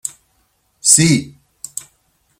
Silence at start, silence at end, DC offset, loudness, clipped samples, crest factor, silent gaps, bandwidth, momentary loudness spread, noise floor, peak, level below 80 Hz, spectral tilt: 0.05 s; 1.1 s; under 0.1%; -12 LUFS; under 0.1%; 20 dB; none; 16.5 kHz; 21 LU; -62 dBFS; 0 dBFS; -52 dBFS; -3 dB/octave